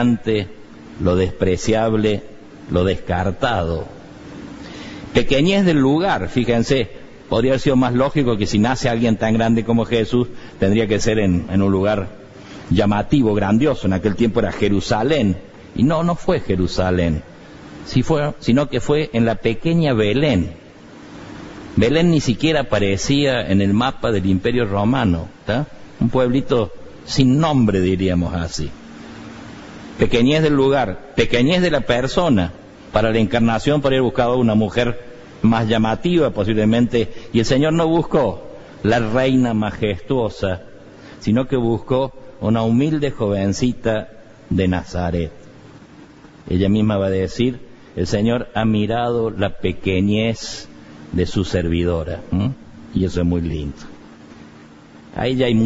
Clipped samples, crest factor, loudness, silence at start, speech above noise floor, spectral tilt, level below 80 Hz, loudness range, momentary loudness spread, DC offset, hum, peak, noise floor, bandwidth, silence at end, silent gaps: under 0.1%; 16 dB; -18 LUFS; 0 s; 26 dB; -6.5 dB/octave; -36 dBFS; 4 LU; 13 LU; under 0.1%; none; -2 dBFS; -43 dBFS; 8 kHz; 0 s; none